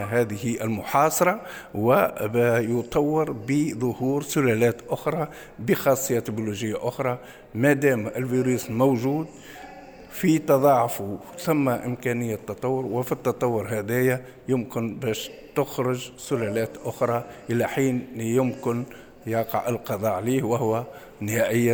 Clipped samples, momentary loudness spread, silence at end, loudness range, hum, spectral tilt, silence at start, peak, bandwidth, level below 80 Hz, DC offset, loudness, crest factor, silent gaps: under 0.1%; 11 LU; 0 s; 4 LU; none; -6 dB/octave; 0 s; -6 dBFS; over 20 kHz; -56 dBFS; under 0.1%; -25 LUFS; 18 dB; none